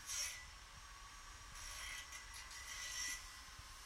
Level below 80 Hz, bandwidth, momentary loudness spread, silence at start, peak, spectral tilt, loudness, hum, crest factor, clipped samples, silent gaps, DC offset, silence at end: -62 dBFS; 16.5 kHz; 13 LU; 0 s; -32 dBFS; 0.5 dB/octave; -48 LUFS; none; 20 dB; under 0.1%; none; under 0.1%; 0 s